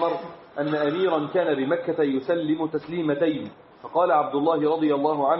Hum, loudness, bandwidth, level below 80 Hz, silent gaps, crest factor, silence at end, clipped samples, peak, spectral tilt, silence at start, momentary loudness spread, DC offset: none; -24 LUFS; 5.8 kHz; -70 dBFS; none; 16 dB; 0 s; under 0.1%; -8 dBFS; -5 dB/octave; 0 s; 9 LU; under 0.1%